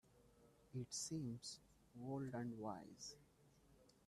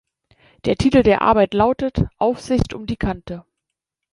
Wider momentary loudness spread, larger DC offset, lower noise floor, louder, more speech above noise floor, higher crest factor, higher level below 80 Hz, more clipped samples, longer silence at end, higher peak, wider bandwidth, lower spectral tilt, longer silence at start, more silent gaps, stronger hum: about the same, 11 LU vs 12 LU; neither; second, -72 dBFS vs -82 dBFS; second, -50 LUFS vs -18 LUFS; second, 23 dB vs 64 dB; about the same, 18 dB vs 18 dB; second, -78 dBFS vs -36 dBFS; neither; second, 0.15 s vs 0.7 s; second, -36 dBFS vs -2 dBFS; first, 14 kHz vs 11.5 kHz; second, -4.5 dB/octave vs -7 dB/octave; second, 0.05 s vs 0.65 s; neither; neither